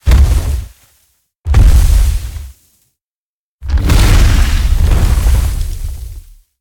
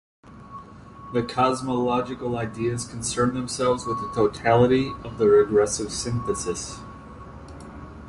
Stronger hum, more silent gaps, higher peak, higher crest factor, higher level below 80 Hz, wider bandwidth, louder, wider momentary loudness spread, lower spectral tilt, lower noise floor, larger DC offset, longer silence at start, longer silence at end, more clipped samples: neither; first, 1.36-1.40 s, 3.01-3.59 s vs none; first, 0 dBFS vs -6 dBFS; second, 10 dB vs 18 dB; first, -12 dBFS vs -46 dBFS; first, 17.5 kHz vs 11.5 kHz; first, -13 LUFS vs -23 LUFS; second, 18 LU vs 23 LU; about the same, -5.5 dB/octave vs -5 dB/octave; first, under -90 dBFS vs -43 dBFS; neither; second, 0.05 s vs 0.25 s; first, 0.4 s vs 0 s; neither